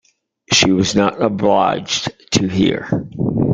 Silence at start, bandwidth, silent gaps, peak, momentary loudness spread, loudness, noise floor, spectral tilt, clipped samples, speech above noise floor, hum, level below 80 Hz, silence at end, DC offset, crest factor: 0.5 s; 9.4 kHz; none; 0 dBFS; 8 LU; -16 LUFS; -38 dBFS; -4.5 dB/octave; under 0.1%; 22 dB; none; -46 dBFS; 0 s; under 0.1%; 16 dB